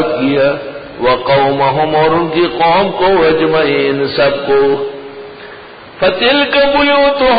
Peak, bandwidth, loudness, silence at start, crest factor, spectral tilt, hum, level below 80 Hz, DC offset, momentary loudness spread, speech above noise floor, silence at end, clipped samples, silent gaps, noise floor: -2 dBFS; 5 kHz; -11 LUFS; 0 s; 10 dB; -11 dB/octave; none; -42 dBFS; under 0.1%; 17 LU; 22 dB; 0 s; under 0.1%; none; -33 dBFS